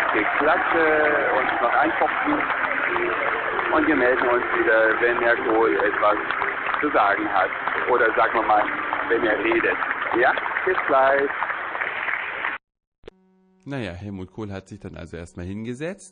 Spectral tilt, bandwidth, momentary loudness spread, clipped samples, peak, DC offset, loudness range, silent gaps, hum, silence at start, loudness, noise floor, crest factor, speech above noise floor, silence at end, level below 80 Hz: -6 dB/octave; 9.6 kHz; 15 LU; under 0.1%; -8 dBFS; under 0.1%; 10 LU; 12.87-12.92 s, 12.98-13.03 s; none; 0 s; -21 LUFS; -59 dBFS; 14 dB; 38 dB; 0.05 s; -54 dBFS